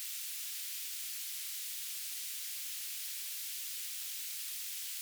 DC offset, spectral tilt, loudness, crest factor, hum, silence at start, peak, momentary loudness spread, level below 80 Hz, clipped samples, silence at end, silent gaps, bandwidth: under 0.1%; 10 dB/octave; -38 LUFS; 14 dB; none; 0 s; -28 dBFS; 0 LU; under -90 dBFS; under 0.1%; 0 s; none; over 20 kHz